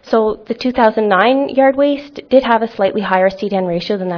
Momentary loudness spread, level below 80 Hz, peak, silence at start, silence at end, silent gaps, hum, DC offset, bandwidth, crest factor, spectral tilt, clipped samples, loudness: 7 LU; -50 dBFS; 0 dBFS; 0.05 s; 0 s; none; none; under 0.1%; 5.4 kHz; 14 dB; -7 dB/octave; under 0.1%; -14 LUFS